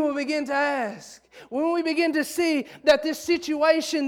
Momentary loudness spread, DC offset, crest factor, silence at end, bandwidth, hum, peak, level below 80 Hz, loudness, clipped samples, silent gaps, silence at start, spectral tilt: 7 LU; under 0.1%; 16 dB; 0 s; 17.5 kHz; none; -8 dBFS; -64 dBFS; -24 LUFS; under 0.1%; none; 0 s; -2.5 dB/octave